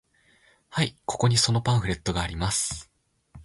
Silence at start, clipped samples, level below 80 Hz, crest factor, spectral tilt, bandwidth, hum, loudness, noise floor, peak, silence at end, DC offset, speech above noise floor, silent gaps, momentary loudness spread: 0.7 s; under 0.1%; -44 dBFS; 20 dB; -4 dB/octave; 11.5 kHz; none; -25 LUFS; -61 dBFS; -8 dBFS; 0 s; under 0.1%; 36 dB; none; 9 LU